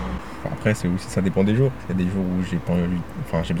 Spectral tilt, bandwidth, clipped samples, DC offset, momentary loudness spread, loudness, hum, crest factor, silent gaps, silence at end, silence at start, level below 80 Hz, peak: -7.5 dB/octave; 14.5 kHz; under 0.1%; 1%; 8 LU; -23 LUFS; none; 18 dB; none; 0 s; 0 s; -40 dBFS; -6 dBFS